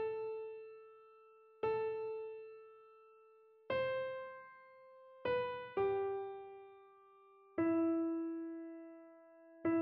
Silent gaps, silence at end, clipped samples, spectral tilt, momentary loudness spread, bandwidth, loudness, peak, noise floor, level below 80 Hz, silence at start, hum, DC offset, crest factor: none; 0 s; under 0.1%; -4.5 dB/octave; 24 LU; 5.2 kHz; -40 LUFS; -24 dBFS; -65 dBFS; -78 dBFS; 0 s; none; under 0.1%; 16 dB